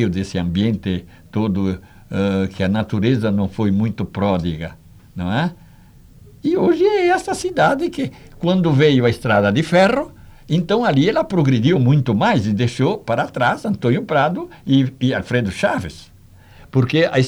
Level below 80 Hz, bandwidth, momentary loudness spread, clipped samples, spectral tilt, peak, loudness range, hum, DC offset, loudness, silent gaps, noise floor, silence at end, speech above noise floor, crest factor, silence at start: -46 dBFS; 12.5 kHz; 10 LU; under 0.1%; -7 dB/octave; -4 dBFS; 4 LU; none; under 0.1%; -18 LUFS; none; -45 dBFS; 0 s; 28 dB; 14 dB; 0 s